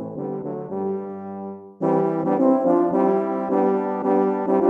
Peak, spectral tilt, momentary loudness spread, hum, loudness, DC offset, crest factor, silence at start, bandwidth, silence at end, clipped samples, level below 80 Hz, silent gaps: -6 dBFS; -10.5 dB/octave; 13 LU; none; -22 LUFS; under 0.1%; 16 dB; 0 s; 3.5 kHz; 0 s; under 0.1%; -68 dBFS; none